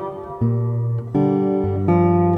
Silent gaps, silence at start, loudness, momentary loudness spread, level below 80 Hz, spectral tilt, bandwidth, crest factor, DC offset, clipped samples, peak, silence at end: none; 0 s; -19 LUFS; 7 LU; -48 dBFS; -12 dB/octave; 3.7 kHz; 14 dB; under 0.1%; under 0.1%; -4 dBFS; 0 s